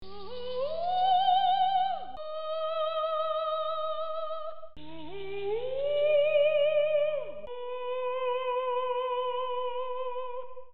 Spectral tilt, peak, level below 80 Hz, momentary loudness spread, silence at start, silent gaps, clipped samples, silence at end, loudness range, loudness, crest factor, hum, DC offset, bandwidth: -5.5 dB/octave; -16 dBFS; -64 dBFS; 15 LU; 0 s; none; under 0.1%; 0 s; 5 LU; -30 LUFS; 14 dB; none; 1%; 5.2 kHz